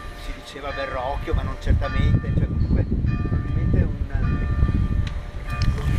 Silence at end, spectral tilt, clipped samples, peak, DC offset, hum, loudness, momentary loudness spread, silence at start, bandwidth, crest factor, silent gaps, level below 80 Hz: 0 s; -8 dB/octave; under 0.1%; -6 dBFS; under 0.1%; none; -24 LUFS; 10 LU; 0 s; 10 kHz; 16 dB; none; -26 dBFS